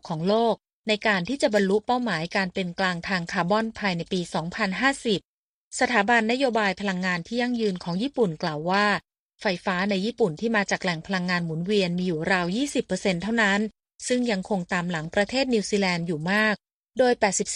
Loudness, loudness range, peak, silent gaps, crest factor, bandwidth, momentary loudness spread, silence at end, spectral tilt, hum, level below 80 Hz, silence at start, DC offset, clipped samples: -25 LUFS; 1 LU; -6 dBFS; 0.73-0.84 s, 5.25-5.71 s, 9.19-9.29 s, 16.74-16.84 s; 18 dB; 11 kHz; 6 LU; 0 s; -4.5 dB/octave; none; -58 dBFS; 0.05 s; under 0.1%; under 0.1%